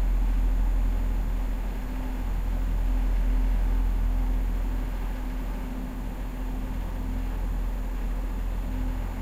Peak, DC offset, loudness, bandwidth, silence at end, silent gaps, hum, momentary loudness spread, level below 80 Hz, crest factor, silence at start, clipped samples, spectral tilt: -16 dBFS; under 0.1%; -31 LUFS; 15 kHz; 0 s; none; none; 6 LU; -26 dBFS; 10 dB; 0 s; under 0.1%; -7 dB/octave